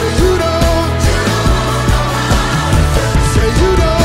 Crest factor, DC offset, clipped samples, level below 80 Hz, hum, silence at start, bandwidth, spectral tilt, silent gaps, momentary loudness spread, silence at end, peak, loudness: 10 dB; under 0.1%; under 0.1%; -16 dBFS; none; 0 s; 16 kHz; -5 dB/octave; none; 2 LU; 0 s; -2 dBFS; -13 LUFS